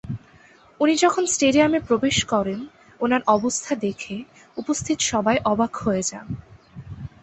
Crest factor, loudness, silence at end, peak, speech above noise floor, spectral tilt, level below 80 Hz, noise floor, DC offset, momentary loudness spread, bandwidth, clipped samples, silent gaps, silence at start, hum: 20 dB; -21 LUFS; 0.15 s; -4 dBFS; 30 dB; -3.5 dB/octave; -50 dBFS; -52 dBFS; under 0.1%; 18 LU; 8.6 kHz; under 0.1%; none; 0.05 s; none